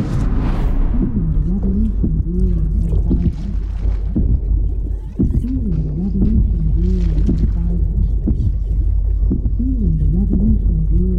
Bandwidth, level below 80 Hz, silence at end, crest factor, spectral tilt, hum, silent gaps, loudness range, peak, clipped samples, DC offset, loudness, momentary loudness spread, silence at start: 2.9 kHz; -16 dBFS; 0 s; 10 dB; -10.5 dB/octave; none; none; 2 LU; -4 dBFS; under 0.1%; under 0.1%; -19 LUFS; 4 LU; 0 s